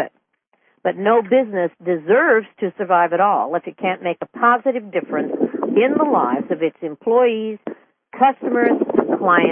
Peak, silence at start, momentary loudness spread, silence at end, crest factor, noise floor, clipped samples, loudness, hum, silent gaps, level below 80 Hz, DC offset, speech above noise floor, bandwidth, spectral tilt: -2 dBFS; 0 s; 10 LU; 0 s; 16 dB; -65 dBFS; under 0.1%; -18 LUFS; none; none; -70 dBFS; under 0.1%; 48 dB; 3.6 kHz; -11 dB/octave